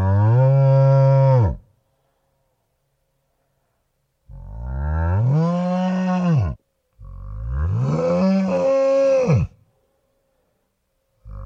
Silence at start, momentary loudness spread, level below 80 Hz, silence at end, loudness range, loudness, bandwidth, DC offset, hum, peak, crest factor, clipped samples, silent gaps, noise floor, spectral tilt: 0 s; 18 LU; -36 dBFS; 0 s; 8 LU; -18 LUFS; 7 kHz; under 0.1%; none; -6 dBFS; 14 dB; under 0.1%; none; -70 dBFS; -9.5 dB/octave